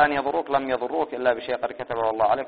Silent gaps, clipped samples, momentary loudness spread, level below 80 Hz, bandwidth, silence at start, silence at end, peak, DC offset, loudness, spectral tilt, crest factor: none; under 0.1%; 7 LU; -58 dBFS; 4.9 kHz; 0 s; 0 s; -4 dBFS; 0.1%; -25 LUFS; -2.5 dB/octave; 20 dB